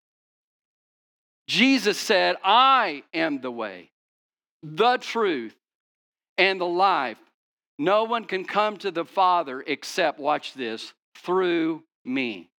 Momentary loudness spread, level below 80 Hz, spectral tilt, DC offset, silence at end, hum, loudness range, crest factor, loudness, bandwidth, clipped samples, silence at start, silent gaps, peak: 13 LU; under -90 dBFS; -3.5 dB/octave; under 0.1%; 0.15 s; none; 5 LU; 22 dB; -23 LUFS; 19 kHz; under 0.1%; 1.5 s; 3.92-4.29 s, 4.49-4.60 s, 5.75-6.12 s, 6.29-6.36 s, 7.34-7.57 s, 7.67-7.78 s, 11.04-11.12 s, 11.95-12.05 s; -4 dBFS